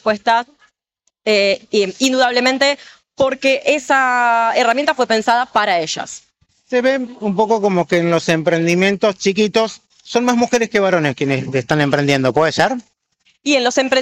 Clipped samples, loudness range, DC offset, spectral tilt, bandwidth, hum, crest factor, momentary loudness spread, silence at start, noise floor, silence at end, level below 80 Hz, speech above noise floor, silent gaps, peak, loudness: under 0.1%; 2 LU; under 0.1%; -4.5 dB/octave; 15.5 kHz; none; 12 dB; 7 LU; 0.05 s; -68 dBFS; 0 s; -58 dBFS; 53 dB; none; -4 dBFS; -16 LUFS